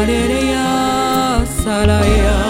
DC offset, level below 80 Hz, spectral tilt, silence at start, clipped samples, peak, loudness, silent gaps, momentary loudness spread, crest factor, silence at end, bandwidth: under 0.1%; -20 dBFS; -5 dB/octave; 0 s; under 0.1%; 0 dBFS; -15 LUFS; none; 4 LU; 14 dB; 0 s; 17 kHz